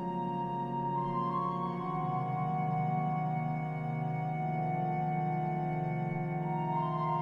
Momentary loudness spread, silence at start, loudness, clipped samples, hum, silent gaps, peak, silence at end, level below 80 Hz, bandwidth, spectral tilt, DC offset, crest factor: 3 LU; 0 s; -34 LUFS; under 0.1%; none; none; -20 dBFS; 0 s; -62 dBFS; 5.4 kHz; -10 dB/octave; under 0.1%; 12 dB